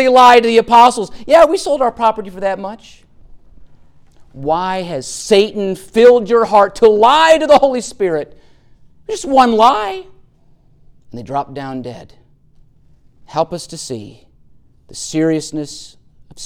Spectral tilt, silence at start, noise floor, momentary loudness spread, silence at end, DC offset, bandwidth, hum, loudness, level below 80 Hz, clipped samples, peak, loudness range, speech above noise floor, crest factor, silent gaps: -4 dB/octave; 0 s; -48 dBFS; 18 LU; 0 s; under 0.1%; 15 kHz; none; -12 LUFS; -46 dBFS; under 0.1%; 0 dBFS; 15 LU; 36 dB; 14 dB; none